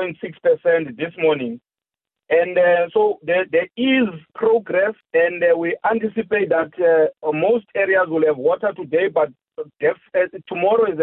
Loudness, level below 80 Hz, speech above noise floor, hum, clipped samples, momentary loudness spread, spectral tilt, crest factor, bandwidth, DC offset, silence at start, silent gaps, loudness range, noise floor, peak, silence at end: -19 LUFS; -64 dBFS; 70 dB; none; under 0.1%; 6 LU; -10 dB/octave; 12 dB; 4 kHz; under 0.1%; 0 s; none; 1 LU; -88 dBFS; -8 dBFS; 0 s